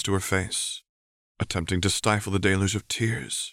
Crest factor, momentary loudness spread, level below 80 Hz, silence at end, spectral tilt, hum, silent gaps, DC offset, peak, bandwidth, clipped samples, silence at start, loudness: 20 dB; 7 LU; -50 dBFS; 0 s; -4 dB/octave; none; 0.89-1.35 s; under 0.1%; -6 dBFS; 16 kHz; under 0.1%; 0 s; -26 LUFS